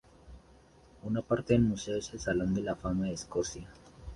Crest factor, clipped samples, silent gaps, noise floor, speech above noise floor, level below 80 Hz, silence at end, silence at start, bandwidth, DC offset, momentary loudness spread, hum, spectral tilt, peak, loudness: 20 dB; under 0.1%; none; -59 dBFS; 28 dB; -50 dBFS; 0 s; 0.25 s; 11.5 kHz; under 0.1%; 18 LU; none; -6 dB/octave; -12 dBFS; -32 LUFS